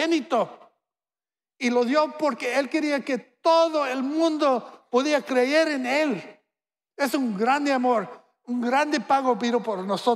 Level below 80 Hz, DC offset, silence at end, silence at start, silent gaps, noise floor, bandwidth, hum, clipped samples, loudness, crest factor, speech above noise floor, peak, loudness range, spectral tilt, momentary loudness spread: -82 dBFS; under 0.1%; 0 s; 0 s; none; under -90 dBFS; 14.5 kHz; none; under 0.1%; -24 LUFS; 16 dB; over 67 dB; -8 dBFS; 3 LU; -4 dB/octave; 7 LU